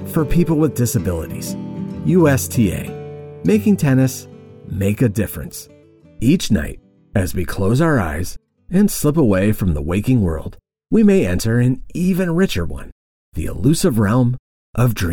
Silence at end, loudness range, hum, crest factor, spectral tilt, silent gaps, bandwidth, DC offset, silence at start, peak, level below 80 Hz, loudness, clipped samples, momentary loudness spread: 0 s; 3 LU; none; 14 dB; -6.5 dB/octave; 12.92-13.32 s, 14.39-14.73 s; 19.5 kHz; under 0.1%; 0 s; -4 dBFS; -34 dBFS; -18 LUFS; under 0.1%; 14 LU